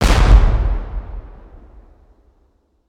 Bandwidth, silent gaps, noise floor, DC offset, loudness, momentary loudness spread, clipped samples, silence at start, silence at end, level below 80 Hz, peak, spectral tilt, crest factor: 11.5 kHz; none; -59 dBFS; under 0.1%; -16 LUFS; 22 LU; under 0.1%; 0 s; 1.6 s; -16 dBFS; 0 dBFS; -5.5 dB/octave; 16 dB